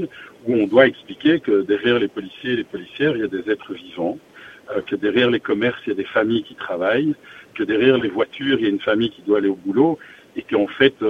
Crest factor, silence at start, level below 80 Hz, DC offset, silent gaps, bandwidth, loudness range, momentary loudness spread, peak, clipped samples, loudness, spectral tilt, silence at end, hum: 20 dB; 0 s; -58 dBFS; under 0.1%; none; 6.8 kHz; 3 LU; 12 LU; 0 dBFS; under 0.1%; -20 LUFS; -7 dB/octave; 0 s; none